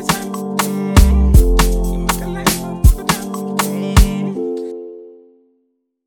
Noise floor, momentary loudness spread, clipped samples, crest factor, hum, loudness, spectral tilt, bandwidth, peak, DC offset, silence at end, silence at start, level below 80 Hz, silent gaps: -66 dBFS; 11 LU; under 0.1%; 14 dB; none; -16 LUFS; -5 dB/octave; 18.5 kHz; 0 dBFS; under 0.1%; 0.95 s; 0 s; -16 dBFS; none